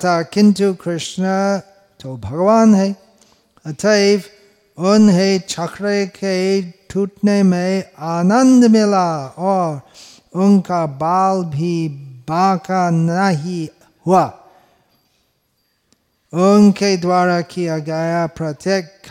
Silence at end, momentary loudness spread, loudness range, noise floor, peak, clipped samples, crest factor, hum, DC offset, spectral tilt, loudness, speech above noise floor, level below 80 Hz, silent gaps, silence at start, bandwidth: 0 s; 14 LU; 4 LU; -65 dBFS; -2 dBFS; under 0.1%; 14 dB; none; under 0.1%; -6 dB/octave; -16 LUFS; 50 dB; -58 dBFS; none; 0 s; 11.5 kHz